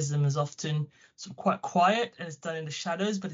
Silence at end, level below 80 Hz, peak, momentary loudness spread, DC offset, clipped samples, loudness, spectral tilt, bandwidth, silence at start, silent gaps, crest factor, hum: 0 s; -74 dBFS; -12 dBFS; 13 LU; under 0.1%; under 0.1%; -29 LUFS; -5 dB/octave; 7.6 kHz; 0 s; none; 18 dB; none